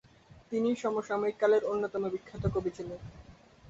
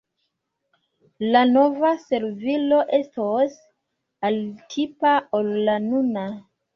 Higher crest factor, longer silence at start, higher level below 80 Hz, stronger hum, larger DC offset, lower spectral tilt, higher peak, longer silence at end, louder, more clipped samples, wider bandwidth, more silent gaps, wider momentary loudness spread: about the same, 18 dB vs 18 dB; second, 0.35 s vs 1.2 s; first, -54 dBFS vs -68 dBFS; neither; neither; about the same, -7 dB/octave vs -6 dB/octave; second, -14 dBFS vs -4 dBFS; second, 0 s vs 0.35 s; second, -31 LUFS vs -22 LUFS; neither; first, 7.8 kHz vs 6.8 kHz; neither; first, 15 LU vs 10 LU